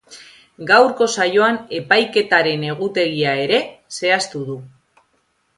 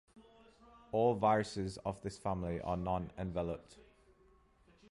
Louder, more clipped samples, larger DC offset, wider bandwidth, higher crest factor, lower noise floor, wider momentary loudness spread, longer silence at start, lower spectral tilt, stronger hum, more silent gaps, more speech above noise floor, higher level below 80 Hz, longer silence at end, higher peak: first, -17 LUFS vs -37 LUFS; neither; neither; about the same, 11.5 kHz vs 11.5 kHz; about the same, 18 dB vs 20 dB; about the same, -65 dBFS vs -67 dBFS; first, 14 LU vs 10 LU; about the same, 0.1 s vs 0.15 s; second, -3.5 dB/octave vs -6.5 dB/octave; neither; neither; first, 47 dB vs 31 dB; second, -64 dBFS vs -56 dBFS; second, 0.9 s vs 1.1 s; first, 0 dBFS vs -18 dBFS